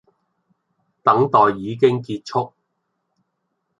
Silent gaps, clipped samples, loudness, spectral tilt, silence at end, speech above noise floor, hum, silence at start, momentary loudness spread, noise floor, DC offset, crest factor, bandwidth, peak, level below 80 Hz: none; under 0.1%; -18 LUFS; -7 dB/octave; 1.3 s; 56 dB; none; 1.05 s; 10 LU; -74 dBFS; under 0.1%; 20 dB; 7.8 kHz; -2 dBFS; -62 dBFS